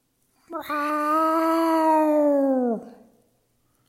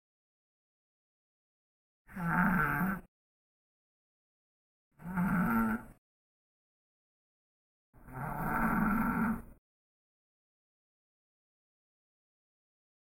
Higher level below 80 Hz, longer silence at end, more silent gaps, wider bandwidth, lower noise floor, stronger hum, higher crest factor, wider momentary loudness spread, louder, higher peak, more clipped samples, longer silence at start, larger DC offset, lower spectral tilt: second, -74 dBFS vs -52 dBFS; second, 0.95 s vs 3.5 s; second, none vs 3.08-4.91 s, 5.98-7.93 s; about the same, 16 kHz vs 16.5 kHz; second, -67 dBFS vs under -90 dBFS; neither; second, 14 dB vs 24 dB; about the same, 12 LU vs 13 LU; first, -22 LUFS vs -33 LUFS; first, -10 dBFS vs -14 dBFS; neither; second, 0.5 s vs 2.1 s; neither; second, -5 dB/octave vs -8 dB/octave